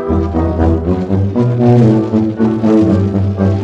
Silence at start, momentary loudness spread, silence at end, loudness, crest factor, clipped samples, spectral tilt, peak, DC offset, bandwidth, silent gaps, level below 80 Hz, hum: 0 s; 6 LU; 0 s; -12 LUFS; 12 dB; under 0.1%; -10 dB/octave; 0 dBFS; under 0.1%; 7.6 kHz; none; -30 dBFS; none